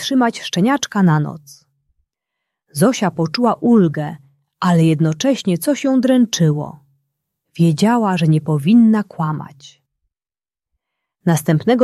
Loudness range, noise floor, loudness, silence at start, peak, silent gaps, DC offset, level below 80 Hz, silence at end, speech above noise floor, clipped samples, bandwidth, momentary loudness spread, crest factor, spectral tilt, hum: 3 LU; under -90 dBFS; -16 LUFS; 0 s; -2 dBFS; none; under 0.1%; -60 dBFS; 0 s; over 75 dB; under 0.1%; 14 kHz; 10 LU; 14 dB; -6 dB/octave; none